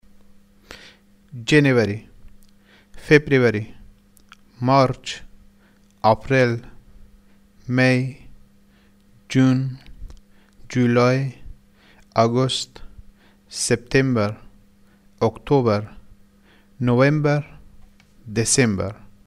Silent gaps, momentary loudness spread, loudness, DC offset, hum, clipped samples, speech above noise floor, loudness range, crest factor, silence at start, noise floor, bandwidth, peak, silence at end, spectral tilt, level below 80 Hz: none; 17 LU; -20 LUFS; under 0.1%; none; under 0.1%; 36 dB; 3 LU; 20 dB; 0.7 s; -54 dBFS; 13 kHz; -2 dBFS; 0.3 s; -5.5 dB/octave; -48 dBFS